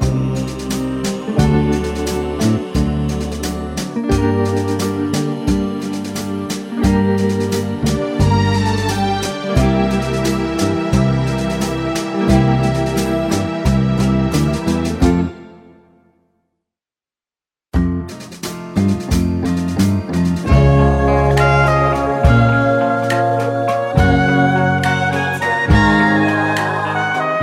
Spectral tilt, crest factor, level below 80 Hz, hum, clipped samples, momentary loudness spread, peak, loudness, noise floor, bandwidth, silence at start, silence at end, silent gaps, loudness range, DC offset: -6.5 dB/octave; 16 dB; -28 dBFS; none; under 0.1%; 9 LU; 0 dBFS; -16 LUFS; under -90 dBFS; 16.5 kHz; 0 s; 0 s; none; 7 LU; under 0.1%